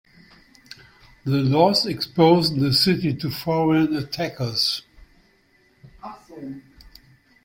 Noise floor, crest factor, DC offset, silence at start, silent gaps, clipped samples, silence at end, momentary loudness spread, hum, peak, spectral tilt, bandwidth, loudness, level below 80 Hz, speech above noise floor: -60 dBFS; 20 dB; under 0.1%; 1.25 s; none; under 0.1%; 0.85 s; 22 LU; none; -4 dBFS; -6 dB/octave; 16.5 kHz; -20 LUFS; -54 dBFS; 40 dB